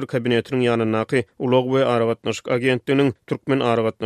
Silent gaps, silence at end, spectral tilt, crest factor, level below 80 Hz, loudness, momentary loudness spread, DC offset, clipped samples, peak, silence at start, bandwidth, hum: none; 0 s; -6.5 dB/octave; 14 dB; -60 dBFS; -20 LUFS; 5 LU; under 0.1%; under 0.1%; -6 dBFS; 0 s; 13 kHz; none